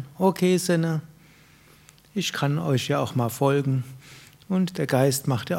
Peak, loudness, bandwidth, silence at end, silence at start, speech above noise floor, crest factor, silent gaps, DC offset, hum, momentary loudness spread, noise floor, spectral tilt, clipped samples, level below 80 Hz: -6 dBFS; -24 LUFS; 16.5 kHz; 0 s; 0 s; 30 dB; 18 dB; none; under 0.1%; none; 8 LU; -54 dBFS; -5.5 dB/octave; under 0.1%; -64 dBFS